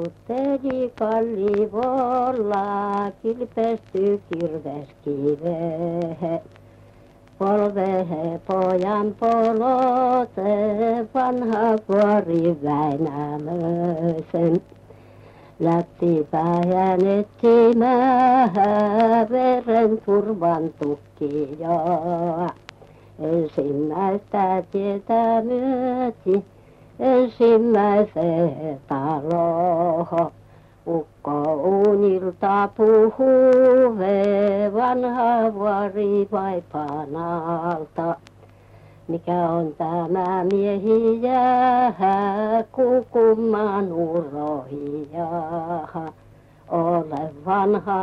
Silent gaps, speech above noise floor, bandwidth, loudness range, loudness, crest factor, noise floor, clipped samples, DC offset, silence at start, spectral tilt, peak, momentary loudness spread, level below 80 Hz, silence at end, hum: none; 29 dB; 7.2 kHz; 8 LU; -21 LUFS; 14 dB; -49 dBFS; under 0.1%; under 0.1%; 0 s; -9 dB/octave; -6 dBFS; 11 LU; -58 dBFS; 0 s; none